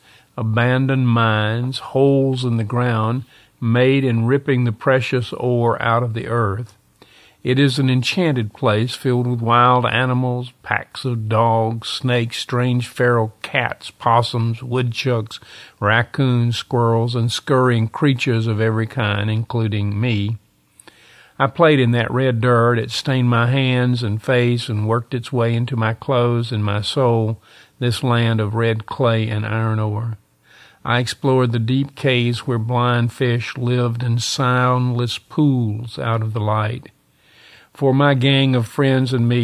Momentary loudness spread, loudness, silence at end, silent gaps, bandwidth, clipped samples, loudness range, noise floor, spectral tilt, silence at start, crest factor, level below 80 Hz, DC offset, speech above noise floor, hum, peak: 7 LU; -18 LUFS; 0 s; none; 12 kHz; under 0.1%; 3 LU; -53 dBFS; -6.5 dB/octave; 0.35 s; 18 dB; -50 dBFS; under 0.1%; 36 dB; none; 0 dBFS